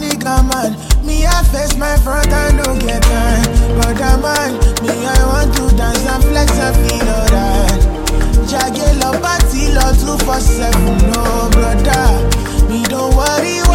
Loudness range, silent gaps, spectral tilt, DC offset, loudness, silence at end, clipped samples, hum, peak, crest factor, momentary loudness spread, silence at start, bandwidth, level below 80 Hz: 1 LU; none; -4.5 dB/octave; under 0.1%; -13 LUFS; 0 s; under 0.1%; none; 0 dBFS; 10 dB; 3 LU; 0 s; 17 kHz; -12 dBFS